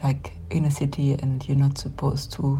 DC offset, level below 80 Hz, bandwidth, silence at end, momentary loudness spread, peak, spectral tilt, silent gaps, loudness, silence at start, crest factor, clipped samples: under 0.1%; -42 dBFS; 12.5 kHz; 0 s; 5 LU; -12 dBFS; -7 dB/octave; none; -25 LUFS; 0 s; 12 dB; under 0.1%